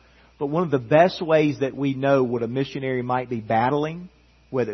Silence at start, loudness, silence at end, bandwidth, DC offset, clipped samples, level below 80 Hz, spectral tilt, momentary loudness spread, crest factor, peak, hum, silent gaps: 0.4 s; -22 LUFS; 0 s; 6.4 kHz; under 0.1%; under 0.1%; -58 dBFS; -7.5 dB/octave; 9 LU; 20 dB; -4 dBFS; none; none